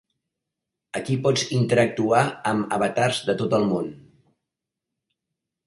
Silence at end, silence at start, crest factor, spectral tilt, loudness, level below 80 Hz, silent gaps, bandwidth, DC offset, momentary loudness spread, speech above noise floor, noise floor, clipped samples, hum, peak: 1.7 s; 0.95 s; 20 dB; -5.5 dB/octave; -22 LUFS; -62 dBFS; none; 11.5 kHz; under 0.1%; 8 LU; 63 dB; -85 dBFS; under 0.1%; none; -4 dBFS